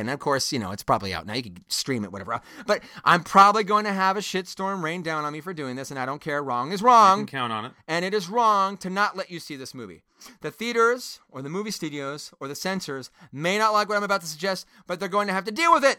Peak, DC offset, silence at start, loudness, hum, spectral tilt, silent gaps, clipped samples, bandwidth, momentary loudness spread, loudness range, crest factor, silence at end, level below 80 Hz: -4 dBFS; under 0.1%; 0 s; -24 LUFS; none; -4 dB/octave; none; under 0.1%; 18 kHz; 17 LU; 6 LU; 22 dB; 0 s; -62 dBFS